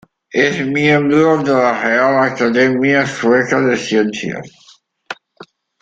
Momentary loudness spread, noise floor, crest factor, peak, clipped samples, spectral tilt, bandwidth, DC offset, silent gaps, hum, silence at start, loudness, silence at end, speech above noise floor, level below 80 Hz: 14 LU; -42 dBFS; 14 dB; -2 dBFS; under 0.1%; -5.5 dB/octave; 9 kHz; under 0.1%; none; none; 0.35 s; -14 LUFS; 0.4 s; 29 dB; -56 dBFS